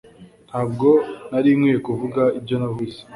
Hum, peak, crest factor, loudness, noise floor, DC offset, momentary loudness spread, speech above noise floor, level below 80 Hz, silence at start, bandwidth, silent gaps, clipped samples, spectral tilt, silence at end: none; -4 dBFS; 16 dB; -20 LUFS; -46 dBFS; under 0.1%; 10 LU; 26 dB; -56 dBFS; 0.2 s; 11.5 kHz; none; under 0.1%; -8.5 dB/octave; 0 s